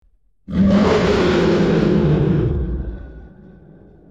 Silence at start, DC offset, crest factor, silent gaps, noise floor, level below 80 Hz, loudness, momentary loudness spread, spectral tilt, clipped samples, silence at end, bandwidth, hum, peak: 0.5 s; 0.1%; 14 dB; none; -45 dBFS; -30 dBFS; -16 LUFS; 12 LU; -7.5 dB/octave; under 0.1%; 0.85 s; 7.8 kHz; none; -4 dBFS